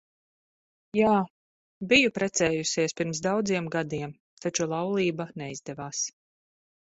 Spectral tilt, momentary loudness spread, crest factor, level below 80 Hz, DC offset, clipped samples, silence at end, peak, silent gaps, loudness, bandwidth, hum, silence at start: -4 dB/octave; 15 LU; 22 dB; -62 dBFS; under 0.1%; under 0.1%; 0.85 s; -8 dBFS; 1.30-1.81 s, 4.20-4.37 s; -27 LUFS; 8.2 kHz; none; 0.95 s